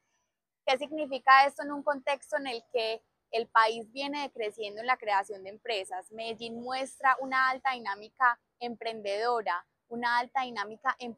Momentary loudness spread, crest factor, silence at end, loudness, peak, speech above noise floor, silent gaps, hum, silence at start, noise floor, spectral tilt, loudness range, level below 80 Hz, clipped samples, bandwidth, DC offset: 12 LU; 24 dB; 0 s; -30 LUFS; -8 dBFS; 53 dB; none; none; 0.65 s; -83 dBFS; -2 dB/octave; 4 LU; -80 dBFS; under 0.1%; 13 kHz; under 0.1%